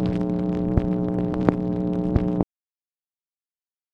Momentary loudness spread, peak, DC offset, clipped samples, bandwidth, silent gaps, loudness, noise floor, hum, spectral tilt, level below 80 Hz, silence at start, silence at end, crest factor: 3 LU; 0 dBFS; under 0.1%; under 0.1%; 5.6 kHz; none; -24 LUFS; under -90 dBFS; none; -10.5 dB/octave; -36 dBFS; 0 s; 1.5 s; 24 dB